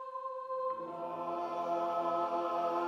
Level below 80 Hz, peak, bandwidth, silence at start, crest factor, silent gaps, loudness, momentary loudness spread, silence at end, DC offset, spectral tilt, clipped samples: under -90 dBFS; -22 dBFS; 12.5 kHz; 0 s; 12 dB; none; -36 LUFS; 7 LU; 0 s; under 0.1%; -6 dB/octave; under 0.1%